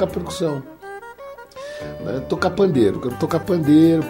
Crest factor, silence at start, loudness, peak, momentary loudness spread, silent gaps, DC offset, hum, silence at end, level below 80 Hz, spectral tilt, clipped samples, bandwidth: 16 dB; 0 s; -20 LUFS; -4 dBFS; 21 LU; none; under 0.1%; 60 Hz at -50 dBFS; 0 s; -48 dBFS; -7 dB/octave; under 0.1%; 16 kHz